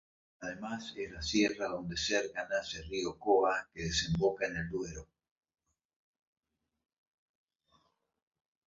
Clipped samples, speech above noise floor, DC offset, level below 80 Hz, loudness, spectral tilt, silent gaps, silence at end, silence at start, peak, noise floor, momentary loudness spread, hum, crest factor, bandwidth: under 0.1%; 39 dB; under 0.1%; -56 dBFS; -34 LUFS; -3 dB/octave; none; 3.65 s; 0.4 s; -16 dBFS; -74 dBFS; 13 LU; none; 20 dB; 7.4 kHz